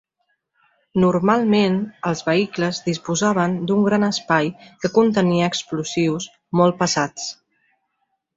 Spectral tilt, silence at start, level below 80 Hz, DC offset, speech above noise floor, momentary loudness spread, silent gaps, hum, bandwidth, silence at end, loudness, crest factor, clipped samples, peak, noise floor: -5 dB/octave; 0.95 s; -58 dBFS; under 0.1%; 54 dB; 8 LU; none; none; 8 kHz; 1.05 s; -20 LUFS; 18 dB; under 0.1%; -2 dBFS; -73 dBFS